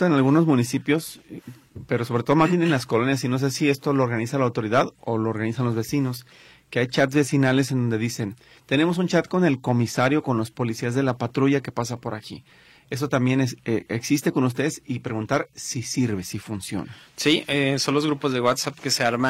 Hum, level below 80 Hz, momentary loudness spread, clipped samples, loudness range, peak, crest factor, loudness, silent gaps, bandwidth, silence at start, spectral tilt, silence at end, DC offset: none; -60 dBFS; 11 LU; under 0.1%; 3 LU; -6 dBFS; 16 dB; -23 LUFS; none; 16 kHz; 0 s; -5.5 dB/octave; 0 s; under 0.1%